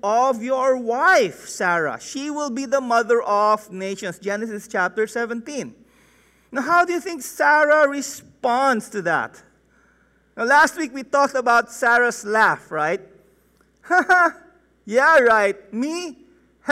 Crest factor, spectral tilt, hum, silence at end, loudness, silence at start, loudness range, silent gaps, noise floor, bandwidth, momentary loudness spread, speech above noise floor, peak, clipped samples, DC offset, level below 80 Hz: 14 dB; -3.5 dB/octave; none; 0 s; -19 LUFS; 0.05 s; 4 LU; none; -59 dBFS; 16 kHz; 13 LU; 40 dB; -6 dBFS; under 0.1%; under 0.1%; -64 dBFS